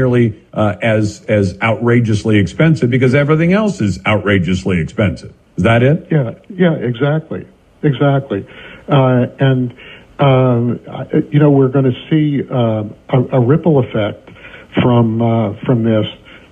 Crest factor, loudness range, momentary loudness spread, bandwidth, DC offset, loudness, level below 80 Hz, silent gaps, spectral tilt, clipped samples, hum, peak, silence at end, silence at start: 12 dB; 3 LU; 10 LU; 9.2 kHz; under 0.1%; -14 LUFS; -46 dBFS; none; -8 dB/octave; under 0.1%; none; 0 dBFS; 0.15 s; 0 s